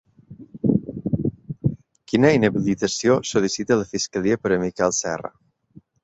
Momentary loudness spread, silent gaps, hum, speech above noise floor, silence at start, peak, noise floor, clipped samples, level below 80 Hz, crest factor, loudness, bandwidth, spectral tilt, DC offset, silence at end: 9 LU; none; none; 31 dB; 0.3 s; -2 dBFS; -52 dBFS; under 0.1%; -52 dBFS; 20 dB; -22 LUFS; 8.2 kHz; -5 dB/octave; under 0.1%; 0.75 s